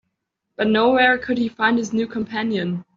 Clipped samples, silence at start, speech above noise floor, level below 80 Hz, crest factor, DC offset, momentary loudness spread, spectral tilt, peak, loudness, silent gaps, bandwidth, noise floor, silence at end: under 0.1%; 0.6 s; 57 dB; -58 dBFS; 16 dB; under 0.1%; 9 LU; -3 dB/octave; -4 dBFS; -20 LUFS; none; 7.4 kHz; -77 dBFS; 0.15 s